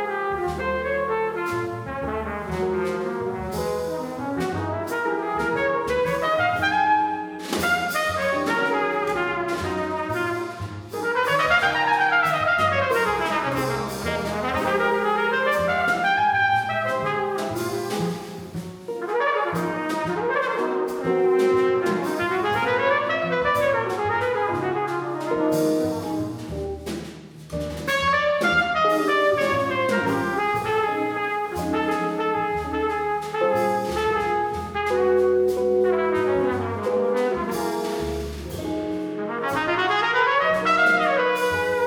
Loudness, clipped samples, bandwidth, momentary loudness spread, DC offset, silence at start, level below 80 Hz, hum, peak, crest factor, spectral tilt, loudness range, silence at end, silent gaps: -23 LUFS; under 0.1%; over 20 kHz; 9 LU; under 0.1%; 0 s; -48 dBFS; none; -6 dBFS; 18 dB; -5 dB/octave; 5 LU; 0 s; none